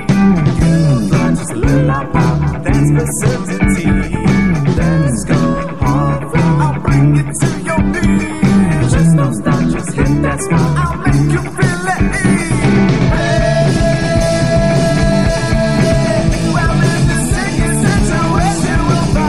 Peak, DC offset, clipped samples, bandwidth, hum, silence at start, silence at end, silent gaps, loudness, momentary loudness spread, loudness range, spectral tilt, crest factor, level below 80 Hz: 0 dBFS; 3%; under 0.1%; 13 kHz; none; 0 s; 0 s; none; -13 LUFS; 4 LU; 1 LU; -6.5 dB/octave; 12 dB; -22 dBFS